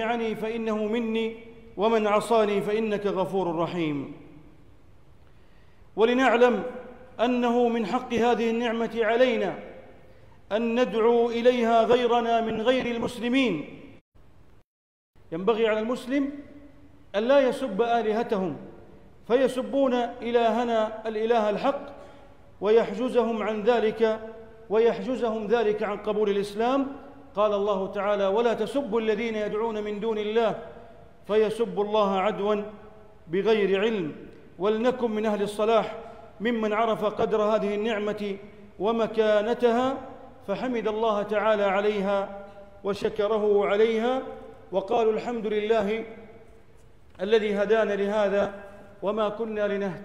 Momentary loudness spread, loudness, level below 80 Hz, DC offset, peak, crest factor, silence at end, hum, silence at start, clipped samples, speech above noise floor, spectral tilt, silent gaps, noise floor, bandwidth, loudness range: 12 LU; -25 LUFS; -58 dBFS; 0.3%; -10 dBFS; 16 dB; 0 s; none; 0 s; under 0.1%; 31 dB; -6 dB/octave; 14.01-14.12 s, 14.64-15.14 s; -56 dBFS; 11.5 kHz; 3 LU